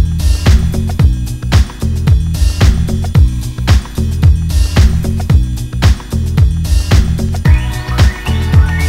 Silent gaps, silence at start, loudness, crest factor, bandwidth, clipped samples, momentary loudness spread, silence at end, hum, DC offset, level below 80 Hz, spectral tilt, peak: none; 0 s; -13 LUFS; 10 dB; 15.5 kHz; 1%; 5 LU; 0 s; none; under 0.1%; -14 dBFS; -6 dB/octave; 0 dBFS